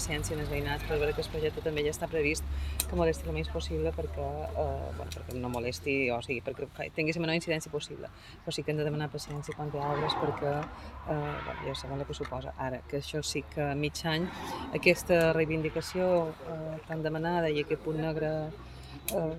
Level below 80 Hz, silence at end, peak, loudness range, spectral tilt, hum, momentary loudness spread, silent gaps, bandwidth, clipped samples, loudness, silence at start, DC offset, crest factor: -46 dBFS; 0 s; -8 dBFS; 5 LU; -5 dB/octave; none; 10 LU; none; 16.5 kHz; under 0.1%; -32 LUFS; 0 s; under 0.1%; 24 dB